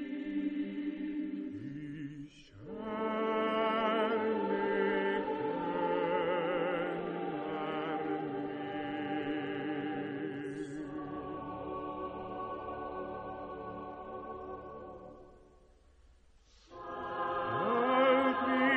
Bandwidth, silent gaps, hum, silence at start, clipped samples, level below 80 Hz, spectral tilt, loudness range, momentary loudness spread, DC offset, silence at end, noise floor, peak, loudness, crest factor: 8.8 kHz; none; none; 0 s; under 0.1%; -64 dBFS; -7 dB/octave; 12 LU; 14 LU; under 0.1%; 0 s; -62 dBFS; -16 dBFS; -35 LUFS; 20 dB